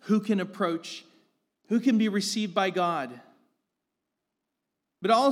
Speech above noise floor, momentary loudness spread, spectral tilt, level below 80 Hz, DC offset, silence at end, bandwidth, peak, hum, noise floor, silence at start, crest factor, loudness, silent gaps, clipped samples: 58 dB; 11 LU; -5 dB/octave; under -90 dBFS; under 0.1%; 0 s; 14 kHz; -10 dBFS; none; -84 dBFS; 0.05 s; 18 dB; -27 LUFS; none; under 0.1%